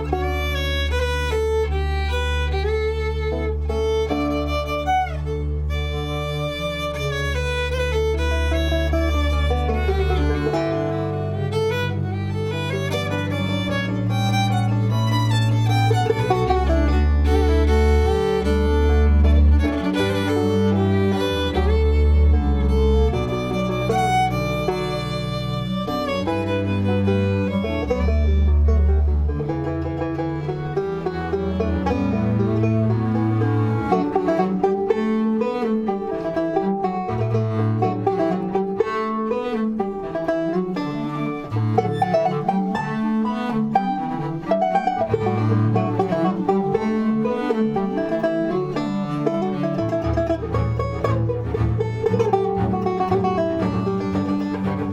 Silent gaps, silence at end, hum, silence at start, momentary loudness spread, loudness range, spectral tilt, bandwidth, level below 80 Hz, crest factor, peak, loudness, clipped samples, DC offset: none; 0 s; none; 0 s; 6 LU; 5 LU; -7.5 dB/octave; 12.5 kHz; -26 dBFS; 16 dB; -4 dBFS; -21 LUFS; under 0.1%; under 0.1%